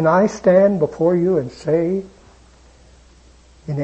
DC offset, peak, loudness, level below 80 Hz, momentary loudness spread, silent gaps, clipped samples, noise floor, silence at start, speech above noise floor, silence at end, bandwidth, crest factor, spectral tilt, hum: under 0.1%; -2 dBFS; -17 LUFS; -50 dBFS; 12 LU; none; under 0.1%; -48 dBFS; 0 s; 32 dB; 0 s; 8.6 kHz; 16 dB; -8 dB/octave; none